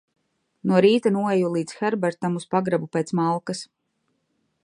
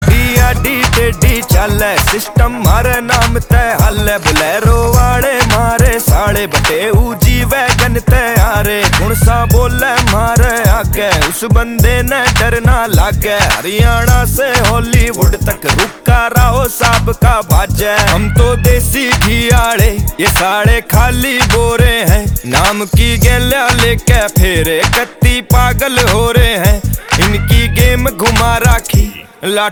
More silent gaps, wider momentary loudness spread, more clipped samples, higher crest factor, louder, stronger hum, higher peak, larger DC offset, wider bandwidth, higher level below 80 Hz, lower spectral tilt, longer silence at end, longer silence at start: neither; first, 10 LU vs 3 LU; second, under 0.1% vs 0.3%; first, 18 dB vs 10 dB; second, -23 LUFS vs -10 LUFS; neither; second, -4 dBFS vs 0 dBFS; neither; second, 11 kHz vs over 20 kHz; second, -72 dBFS vs -14 dBFS; first, -6.5 dB/octave vs -4.5 dB/octave; first, 1 s vs 0 s; first, 0.65 s vs 0 s